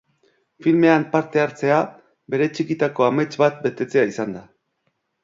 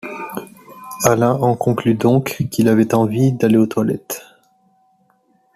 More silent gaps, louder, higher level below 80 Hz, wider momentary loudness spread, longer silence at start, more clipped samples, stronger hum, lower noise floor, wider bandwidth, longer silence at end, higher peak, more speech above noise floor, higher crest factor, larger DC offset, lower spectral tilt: neither; second, -20 LUFS vs -16 LUFS; second, -66 dBFS vs -54 dBFS; second, 11 LU vs 15 LU; first, 0.6 s vs 0.05 s; neither; neither; first, -72 dBFS vs -59 dBFS; second, 7.6 kHz vs 15 kHz; second, 0.85 s vs 1.35 s; about the same, -2 dBFS vs -2 dBFS; first, 52 dB vs 44 dB; about the same, 20 dB vs 16 dB; neither; about the same, -7 dB/octave vs -6.5 dB/octave